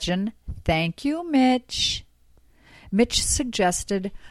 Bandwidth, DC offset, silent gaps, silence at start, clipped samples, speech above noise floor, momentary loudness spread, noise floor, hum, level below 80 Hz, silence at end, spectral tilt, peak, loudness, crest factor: 16 kHz; under 0.1%; none; 0 s; under 0.1%; 32 dB; 8 LU; -56 dBFS; none; -40 dBFS; 0 s; -3.5 dB/octave; -8 dBFS; -23 LUFS; 16 dB